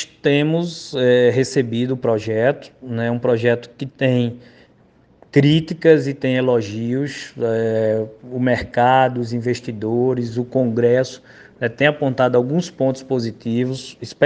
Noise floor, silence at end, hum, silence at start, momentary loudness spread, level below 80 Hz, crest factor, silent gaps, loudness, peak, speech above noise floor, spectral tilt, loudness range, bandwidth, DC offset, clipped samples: -53 dBFS; 0 s; none; 0 s; 10 LU; -54 dBFS; 18 dB; none; -19 LUFS; 0 dBFS; 35 dB; -6.5 dB/octave; 2 LU; 9.4 kHz; under 0.1%; under 0.1%